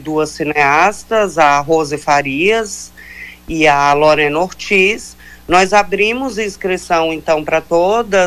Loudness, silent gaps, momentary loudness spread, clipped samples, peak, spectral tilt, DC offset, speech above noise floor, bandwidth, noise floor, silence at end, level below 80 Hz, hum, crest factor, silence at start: -13 LUFS; none; 13 LU; under 0.1%; -2 dBFS; -4 dB/octave; under 0.1%; 20 dB; 15.5 kHz; -34 dBFS; 0 s; -42 dBFS; none; 12 dB; 0 s